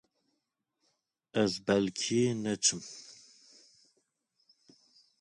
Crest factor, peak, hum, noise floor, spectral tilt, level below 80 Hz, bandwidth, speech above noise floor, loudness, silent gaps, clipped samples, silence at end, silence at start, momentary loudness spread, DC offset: 22 dB; -14 dBFS; none; -83 dBFS; -3.5 dB/octave; -70 dBFS; 11 kHz; 53 dB; -30 LUFS; none; under 0.1%; 2.05 s; 1.35 s; 18 LU; under 0.1%